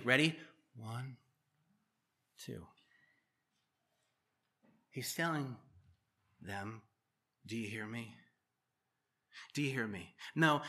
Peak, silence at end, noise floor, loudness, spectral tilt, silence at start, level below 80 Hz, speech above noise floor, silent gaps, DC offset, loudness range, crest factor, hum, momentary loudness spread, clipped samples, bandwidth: -14 dBFS; 0 s; -87 dBFS; -39 LUFS; -4.5 dB/octave; 0 s; -82 dBFS; 49 dB; none; under 0.1%; 16 LU; 28 dB; none; 22 LU; under 0.1%; 14.5 kHz